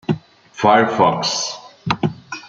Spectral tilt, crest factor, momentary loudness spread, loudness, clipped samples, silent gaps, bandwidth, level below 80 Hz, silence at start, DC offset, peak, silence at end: -4 dB/octave; 18 dB; 12 LU; -18 LUFS; under 0.1%; none; 9.2 kHz; -56 dBFS; 0.1 s; under 0.1%; -2 dBFS; 0 s